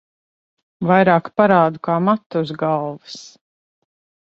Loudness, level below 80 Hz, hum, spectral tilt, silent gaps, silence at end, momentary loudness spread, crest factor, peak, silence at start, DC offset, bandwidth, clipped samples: -17 LUFS; -62 dBFS; none; -7.5 dB/octave; 2.26-2.30 s; 0.95 s; 17 LU; 18 dB; -2 dBFS; 0.8 s; under 0.1%; 7.6 kHz; under 0.1%